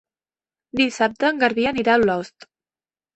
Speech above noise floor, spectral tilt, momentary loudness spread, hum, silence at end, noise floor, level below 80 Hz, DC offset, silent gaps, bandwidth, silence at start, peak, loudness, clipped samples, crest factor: over 70 dB; -4.5 dB/octave; 10 LU; none; 0.85 s; under -90 dBFS; -56 dBFS; under 0.1%; none; 8.4 kHz; 0.75 s; -4 dBFS; -20 LUFS; under 0.1%; 18 dB